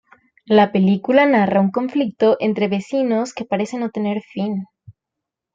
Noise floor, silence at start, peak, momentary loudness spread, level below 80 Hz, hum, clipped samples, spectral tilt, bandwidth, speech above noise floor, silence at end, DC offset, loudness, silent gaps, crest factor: -83 dBFS; 0.5 s; -2 dBFS; 10 LU; -64 dBFS; none; under 0.1%; -7 dB/octave; 7.8 kHz; 66 dB; 0.65 s; under 0.1%; -18 LUFS; none; 16 dB